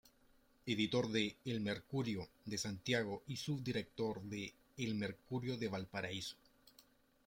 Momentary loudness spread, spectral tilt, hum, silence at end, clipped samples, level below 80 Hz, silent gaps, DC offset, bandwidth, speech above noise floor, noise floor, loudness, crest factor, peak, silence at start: 9 LU; -5 dB/octave; none; 0.45 s; under 0.1%; -72 dBFS; none; under 0.1%; 16.5 kHz; 30 dB; -71 dBFS; -42 LUFS; 20 dB; -22 dBFS; 0.65 s